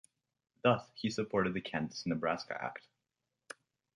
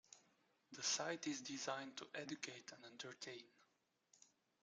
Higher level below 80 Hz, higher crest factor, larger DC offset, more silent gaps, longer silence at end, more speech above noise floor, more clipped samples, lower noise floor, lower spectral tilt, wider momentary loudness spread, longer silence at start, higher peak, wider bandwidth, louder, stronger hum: first, -68 dBFS vs under -90 dBFS; about the same, 22 dB vs 24 dB; neither; neither; first, 1.15 s vs 0.35 s; first, 53 dB vs 35 dB; neither; first, -88 dBFS vs -83 dBFS; first, -5.5 dB/octave vs -1.5 dB/octave; first, 21 LU vs 17 LU; first, 0.65 s vs 0.1 s; first, -14 dBFS vs -28 dBFS; about the same, 11 kHz vs 11 kHz; first, -35 LUFS vs -47 LUFS; neither